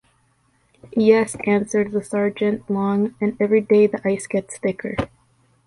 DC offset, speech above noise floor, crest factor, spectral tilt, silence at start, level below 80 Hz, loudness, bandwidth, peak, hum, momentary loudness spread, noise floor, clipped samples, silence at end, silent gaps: under 0.1%; 43 dB; 18 dB; -6.5 dB/octave; 0.85 s; -52 dBFS; -20 LUFS; 11.5 kHz; -2 dBFS; none; 10 LU; -62 dBFS; under 0.1%; 0.6 s; none